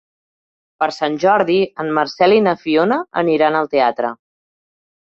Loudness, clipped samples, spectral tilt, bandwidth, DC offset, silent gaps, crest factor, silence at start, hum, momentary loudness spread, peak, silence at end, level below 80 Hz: -16 LUFS; under 0.1%; -6 dB/octave; 7.8 kHz; under 0.1%; none; 16 dB; 0.8 s; none; 7 LU; -2 dBFS; 1 s; -62 dBFS